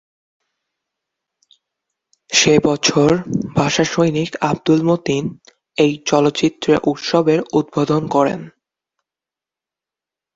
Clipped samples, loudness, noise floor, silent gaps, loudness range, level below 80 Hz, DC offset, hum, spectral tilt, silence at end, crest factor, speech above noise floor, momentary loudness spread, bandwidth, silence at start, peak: under 0.1%; -16 LUFS; -88 dBFS; none; 3 LU; -52 dBFS; under 0.1%; none; -4.5 dB/octave; 1.85 s; 18 dB; 72 dB; 6 LU; 7.8 kHz; 2.3 s; 0 dBFS